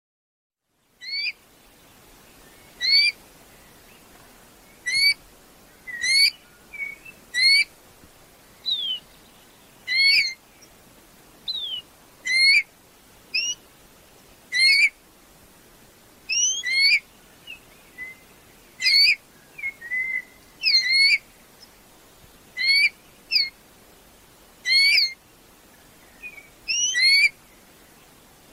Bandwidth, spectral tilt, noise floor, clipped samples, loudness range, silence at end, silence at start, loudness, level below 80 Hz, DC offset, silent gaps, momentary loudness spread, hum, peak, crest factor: 16.5 kHz; 3 dB/octave; -66 dBFS; under 0.1%; 4 LU; 1.2 s; 1 s; -19 LUFS; -62 dBFS; under 0.1%; none; 23 LU; none; -8 dBFS; 18 dB